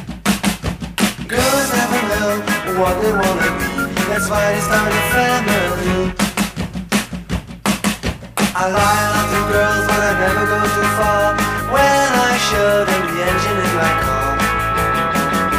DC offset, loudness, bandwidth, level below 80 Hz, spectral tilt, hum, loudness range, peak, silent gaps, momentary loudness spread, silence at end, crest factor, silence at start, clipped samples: under 0.1%; -16 LUFS; 15.5 kHz; -32 dBFS; -4 dB/octave; none; 3 LU; -4 dBFS; none; 6 LU; 0 s; 14 dB; 0 s; under 0.1%